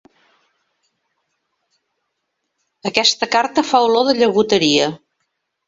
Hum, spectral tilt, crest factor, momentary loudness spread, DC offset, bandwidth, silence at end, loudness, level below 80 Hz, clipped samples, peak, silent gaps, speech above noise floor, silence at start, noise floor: none; -3 dB/octave; 20 dB; 8 LU; under 0.1%; 8 kHz; 0.7 s; -15 LUFS; -62 dBFS; under 0.1%; 0 dBFS; none; 59 dB; 2.85 s; -74 dBFS